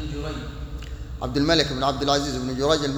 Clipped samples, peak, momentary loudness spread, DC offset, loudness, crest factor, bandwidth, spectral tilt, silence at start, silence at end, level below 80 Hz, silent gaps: under 0.1%; -4 dBFS; 16 LU; under 0.1%; -23 LUFS; 20 dB; over 20 kHz; -4.5 dB/octave; 0 s; 0 s; -36 dBFS; none